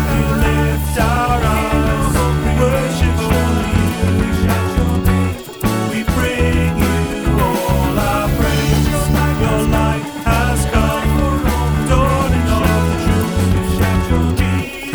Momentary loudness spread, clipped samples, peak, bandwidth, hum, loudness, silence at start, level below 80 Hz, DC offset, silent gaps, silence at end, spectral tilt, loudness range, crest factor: 2 LU; under 0.1%; -2 dBFS; over 20 kHz; none; -16 LUFS; 0 s; -22 dBFS; under 0.1%; none; 0 s; -6 dB/octave; 1 LU; 14 dB